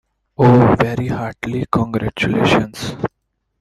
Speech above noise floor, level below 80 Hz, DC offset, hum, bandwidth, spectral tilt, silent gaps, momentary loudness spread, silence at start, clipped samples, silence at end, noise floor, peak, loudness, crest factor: 56 dB; -42 dBFS; under 0.1%; none; 13 kHz; -7 dB/octave; none; 13 LU; 0.4 s; under 0.1%; 0.55 s; -71 dBFS; 0 dBFS; -16 LUFS; 16 dB